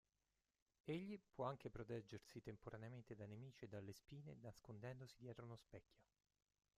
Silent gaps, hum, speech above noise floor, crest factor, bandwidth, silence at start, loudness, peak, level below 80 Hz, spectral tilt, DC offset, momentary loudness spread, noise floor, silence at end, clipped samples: none; none; over 34 dB; 20 dB; 14 kHz; 0.85 s; -56 LUFS; -36 dBFS; -78 dBFS; -7 dB/octave; under 0.1%; 9 LU; under -90 dBFS; 0.75 s; under 0.1%